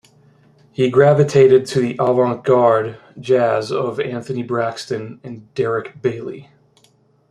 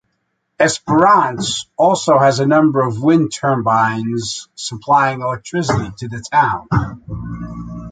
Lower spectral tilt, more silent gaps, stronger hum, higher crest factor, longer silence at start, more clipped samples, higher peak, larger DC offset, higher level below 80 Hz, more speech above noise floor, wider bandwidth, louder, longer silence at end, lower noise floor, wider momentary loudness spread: first, -7 dB/octave vs -5 dB/octave; neither; neither; about the same, 16 dB vs 14 dB; first, 0.8 s vs 0.6 s; neither; about the same, -2 dBFS vs -2 dBFS; neither; second, -58 dBFS vs -42 dBFS; second, 40 dB vs 54 dB; first, 11 kHz vs 9.4 kHz; about the same, -17 LUFS vs -15 LUFS; first, 0.85 s vs 0 s; second, -56 dBFS vs -69 dBFS; first, 18 LU vs 15 LU